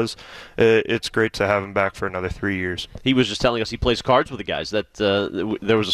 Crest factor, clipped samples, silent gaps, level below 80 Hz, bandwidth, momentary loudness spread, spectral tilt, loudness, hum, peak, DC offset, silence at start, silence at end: 16 dB; under 0.1%; none; -42 dBFS; 13.5 kHz; 9 LU; -5 dB/octave; -21 LUFS; none; -6 dBFS; under 0.1%; 0 s; 0 s